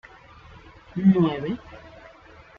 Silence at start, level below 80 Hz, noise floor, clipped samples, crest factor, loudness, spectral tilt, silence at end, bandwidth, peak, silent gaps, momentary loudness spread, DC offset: 0.95 s; -54 dBFS; -49 dBFS; under 0.1%; 18 dB; -23 LUFS; -9.5 dB/octave; 0.7 s; 5 kHz; -8 dBFS; none; 25 LU; under 0.1%